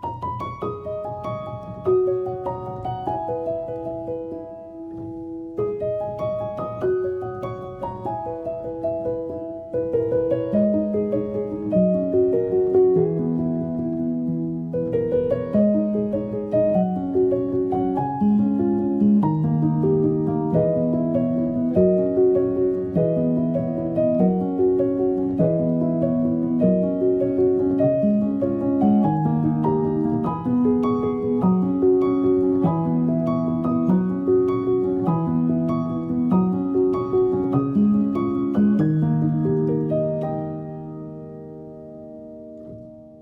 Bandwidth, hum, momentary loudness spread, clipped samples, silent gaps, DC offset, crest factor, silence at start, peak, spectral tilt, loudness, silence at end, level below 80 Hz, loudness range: 4.6 kHz; none; 12 LU; under 0.1%; none; under 0.1%; 14 dB; 0 s; -6 dBFS; -11.5 dB/octave; -22 LUFS; 0 s; -52 dBFS; 7 LU